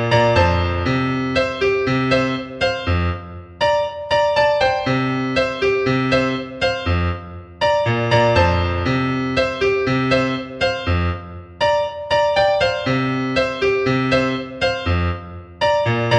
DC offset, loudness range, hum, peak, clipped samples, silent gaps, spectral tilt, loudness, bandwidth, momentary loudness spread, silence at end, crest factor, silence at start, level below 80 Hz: under 0.1%; 2 LU; none; -2 dBFS; under 0.1%; none; -6 dB/octave; -18 LUFS; 9.4 kHz; 6 LU; 0 s; 16 dB; 0 s; -36 dBFS